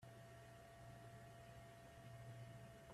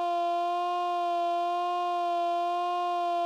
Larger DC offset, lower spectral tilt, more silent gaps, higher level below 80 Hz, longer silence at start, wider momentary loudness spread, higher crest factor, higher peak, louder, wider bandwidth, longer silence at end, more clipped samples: neither; first, -5.5 dB/octave vs -1 dB/octave; neither; first, -74 dBFS vs under -90 dBFS; about the same, 0 s vs 0 s; first, 4 LU vs 1 LU; first, 14 dB vs 6 dB; second, -46 dBFS vs -22 dBFS; second, -60 LUFS vs -29 LUFS; first, 14.5 kHz vs 10.5 kHz; about the same, 0 s vs 0 s; neither